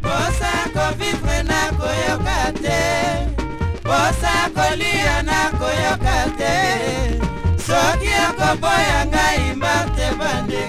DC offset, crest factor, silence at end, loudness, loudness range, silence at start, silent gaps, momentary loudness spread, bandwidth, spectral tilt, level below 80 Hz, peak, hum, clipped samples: under 0.1%; 14 dB; 0 s; -18 LUFS; 2 LU; 0 s; none; 5 LU; 16 kHz; -4 dB/octave; -26 dBFS; -4 dBFS; none; under 0.1%